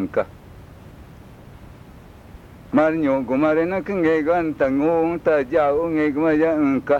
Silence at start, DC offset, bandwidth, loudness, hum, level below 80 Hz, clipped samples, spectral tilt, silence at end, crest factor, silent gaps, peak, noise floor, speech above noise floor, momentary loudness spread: 0 s; under 0.1%; 7.2 kHz; -20 LUFS; none; -48 dBFS; under 0.1%; -8 dB/octave; 0 s; 16 dB; none; -6 dBFS; -43 dBFS; 24 dB; 4 LU